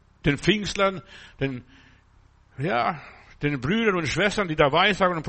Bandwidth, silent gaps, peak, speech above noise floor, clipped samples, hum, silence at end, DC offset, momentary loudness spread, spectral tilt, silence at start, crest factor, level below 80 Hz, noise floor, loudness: 8.8 kHz; none; -6 dBFS; 33 dB; under 0.1%; none; 0 s; under 0.1%; 12 LU; -5 dB/octave; 0.25 s; 18 dB; -46 dBFS; -57 dBFS; -23 LUFS